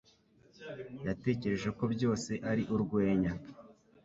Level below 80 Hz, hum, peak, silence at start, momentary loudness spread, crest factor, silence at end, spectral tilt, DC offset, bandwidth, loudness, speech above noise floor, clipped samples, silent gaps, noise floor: -58 dBFS; none; -16 dBFS; 0.6 s; 15 LU; 18 dB; 0.3 s; -7 dB/octave; under 0.1%; 8 kHz; -34 LUFS; 32 dB; under 0.1%; none; -65 dBFS